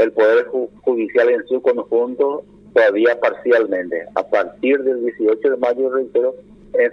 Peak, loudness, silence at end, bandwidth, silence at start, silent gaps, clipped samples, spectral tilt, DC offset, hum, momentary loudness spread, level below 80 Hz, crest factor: 0 dBFS; -18 LUFS; 0 s; 6.2 kHz; 0 s; none; under 0.1%; -6 dB/octave; under 0.1%; 50 Hz at -60 dBFS; 8 LU; -60 dBFS; 16 dB